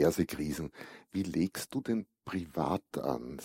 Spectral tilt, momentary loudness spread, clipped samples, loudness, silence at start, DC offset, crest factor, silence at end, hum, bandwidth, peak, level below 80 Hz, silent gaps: -6 dB/octave; 7 LU; under 0.1%; -35 LUFS; 0 s; under 0.1%; 20 dB; 0 s; none; 16 kHz; -14 dBFS; -60 dBFS; none